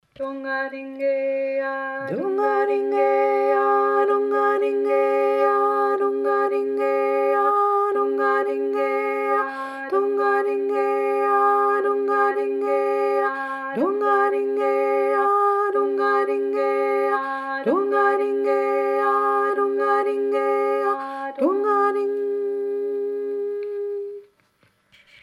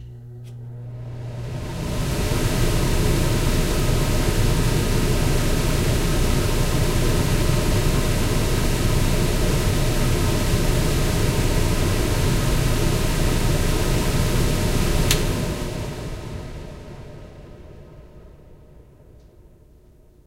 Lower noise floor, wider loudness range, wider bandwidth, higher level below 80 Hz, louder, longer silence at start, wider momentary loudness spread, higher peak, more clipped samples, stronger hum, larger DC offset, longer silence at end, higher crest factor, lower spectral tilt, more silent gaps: first, -63 dBFS vs -50 dBFS; second, 3 LU vs 6 LU; second, 11.5 kHz vs 16 kHz; second, -80 dBFS vs -24 dBFS; about the same, -21 LUFS vs -22 LUFS; first, 0.2 s vs 0 s; second, 8 LU vs 14 LU; second, -8 dBFS vs -2 dBFS; neither; neither; neither; second, 1 s vs 1.7 s; about the same, 14 dB vs 18 dB; about the same, -5.5 dB/octave vs -5 dB/octave; neither